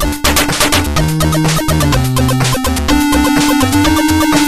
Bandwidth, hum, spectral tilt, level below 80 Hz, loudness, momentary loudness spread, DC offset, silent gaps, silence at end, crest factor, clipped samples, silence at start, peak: 15.5 kHz; none; -4 dB/octave; -22 dBFS; -12 LUFS; 2 LU; under 0.1%; none; 0 s; 12 dB; under 0.1%; 0 s; 0 dBFS